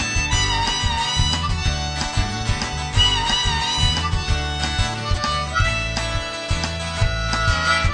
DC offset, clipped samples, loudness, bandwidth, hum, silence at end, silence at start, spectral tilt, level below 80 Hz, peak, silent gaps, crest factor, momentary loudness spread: under 0.1%; under 0.1%; -20 LUFS; 10.5 kHz; none; 0 s; 0 s; -3 dB/octave; -26 dBFS; -4 dBFS; none; 16 dB; 6 LU